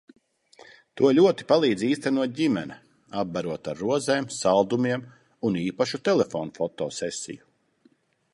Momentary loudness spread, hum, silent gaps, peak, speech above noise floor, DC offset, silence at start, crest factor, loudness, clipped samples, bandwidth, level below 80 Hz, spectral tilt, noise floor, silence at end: 12 LU; none; none; -6 dBFS; 39 dB; under 0.1%; 0.95 s; 20 dB; -25 LUFS; under 0.1%; 11.5 kHz; -66 dBFS; -5 dB/octave; -63 dBFS; 0.95 s